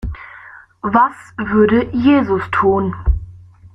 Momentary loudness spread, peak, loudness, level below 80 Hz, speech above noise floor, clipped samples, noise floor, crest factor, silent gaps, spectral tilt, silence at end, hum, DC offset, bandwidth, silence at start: 14 LU; -2 dBFS; -16 LUFS; -28 dBFS; 26 dB; under 0.1%; -40 dBFS; 14 dB; none; -8.5 dB/octave; 0.05 s; none; under 0.1%; 8 kHz; 0.05 s